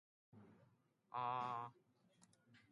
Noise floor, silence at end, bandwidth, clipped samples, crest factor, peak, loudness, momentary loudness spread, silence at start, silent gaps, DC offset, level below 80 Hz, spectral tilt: -77 dBFS; 0.15 s; 11 kHz; under 0.1%; 20 dB; -32 dBFS; -47 LUFS; 23 LU; 0.35 s; none; under 0.1%; under -90 dBFS; -5.5 dB/octave